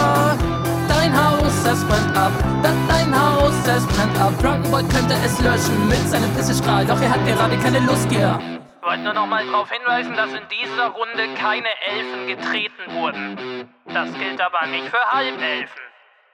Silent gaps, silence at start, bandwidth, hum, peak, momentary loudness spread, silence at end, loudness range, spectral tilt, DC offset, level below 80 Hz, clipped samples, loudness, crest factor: none; 0 s; 17 kHz; none; -2 dBFS; 8 LU; 0.45 s; 6 LU; -5 dB/octave; under 0.1%; -34 dBFS; under 0.1%; -19 LUFS; 16 dB